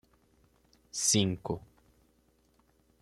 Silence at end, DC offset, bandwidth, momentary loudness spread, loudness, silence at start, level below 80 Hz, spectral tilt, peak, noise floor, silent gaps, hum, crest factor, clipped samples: 1.45 s; under 0.1%; 15.5 kHz; 14 LU; -30 LUFS; 0.95 s; -64 dBFS; -3.5 dB/octave; -12 dBFS; -69 dBFS; none; none; 24 dB; under 0.1%